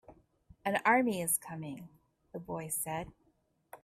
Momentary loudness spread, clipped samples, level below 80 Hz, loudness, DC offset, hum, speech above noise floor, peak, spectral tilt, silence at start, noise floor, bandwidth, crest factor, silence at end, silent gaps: 20 LU; under 0.1%; -68 dBFS; -33 LUFS; under 0.1%; none; 40 dB; -16 dBFS; -3.5 dB/octave; 0.1 s; -74 dBFS; 15.5 kHz; 20 dB; 0.05 s; none